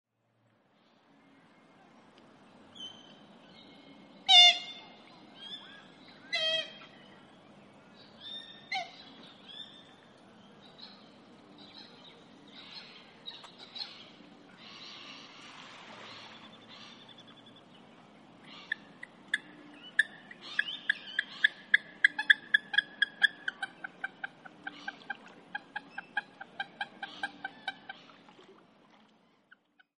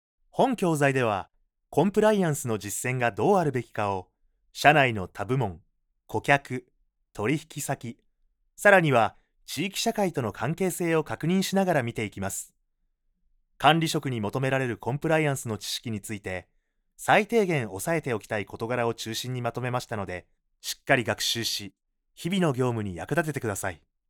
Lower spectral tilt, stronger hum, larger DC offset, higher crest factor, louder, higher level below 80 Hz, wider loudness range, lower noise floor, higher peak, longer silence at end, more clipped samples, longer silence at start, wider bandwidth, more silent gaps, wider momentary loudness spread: second, 0 dB/octave vs -4.5 dB/octave; neither; neither; first, 30 dB vs 24 dB; second, -29 LUFS vs -26 LUFS; second, -86 dBFS vs -60 dBFS; first, 24 LU vs 4 LU; about the same, -73 dBFS vs -74 dBFS; second, -6 dBFS vs -2 dBFS; first, 2.05 s vs 0.35 s; neither; first, 2.8 s vs 0.35 s; second, 11 kHz vs 20 kHz; neither; first, 24 LU vs 13 LU